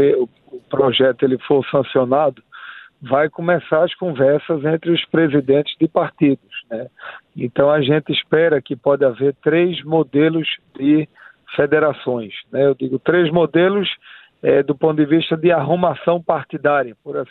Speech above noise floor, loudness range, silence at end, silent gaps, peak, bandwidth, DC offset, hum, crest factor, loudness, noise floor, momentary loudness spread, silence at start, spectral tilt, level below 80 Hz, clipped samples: 21 dB; 2 LU; 0.05 s; none; -2 dBFS; 4.2 kHz; under 0.1%; none; 16 dB; -17 LUFS; -38 dBFS; 11 LU; 0 s; -10 dB/octave; -60 dBFS; under 0.1%